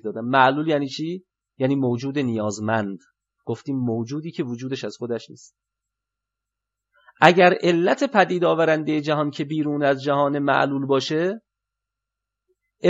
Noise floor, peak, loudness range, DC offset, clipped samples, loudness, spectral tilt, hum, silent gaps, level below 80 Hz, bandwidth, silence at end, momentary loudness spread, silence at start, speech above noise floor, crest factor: -85 dBFS; 0 dBFS; 11 LU; under 0.1%; under 0.1%; -21 LUFS; -6 dB/octave; none; none; -74 dBFS; 8 kHz; 0 s; 13 LU; 0.05 s; 64 dB; 22 dB